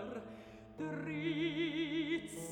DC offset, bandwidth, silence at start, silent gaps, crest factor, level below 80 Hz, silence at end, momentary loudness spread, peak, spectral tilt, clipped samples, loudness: under 0.1%; 18.5 kHz; 0 s; none; 14 dB; -68 dBFS; 0 s; 15 LU; -26 dBFS; -5 dB/octave; under 0.1%; -39 LUFS